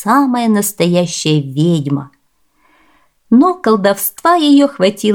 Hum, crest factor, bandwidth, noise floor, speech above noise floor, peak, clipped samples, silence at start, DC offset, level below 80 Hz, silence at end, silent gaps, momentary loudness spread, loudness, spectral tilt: none; 12 dB; 18.5 kHz; -60 dBFS; 48 dB; 0 dBFS; under 0.1%; 0 s; 0.1%; -60 dBFS; 0 s; none; 5 LU; -13 LUFS; -5.5 dB/octave